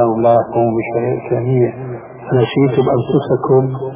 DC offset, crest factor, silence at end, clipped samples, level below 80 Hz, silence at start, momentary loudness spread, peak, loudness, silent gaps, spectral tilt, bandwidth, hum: under 0.1%; 14 dB; 0 s; under 0.1%; -48 dBFS; 0 s; 6 LU; 0 dBFS; -15 LUFS; none; -12 dB/octave; 3.8 kHz; none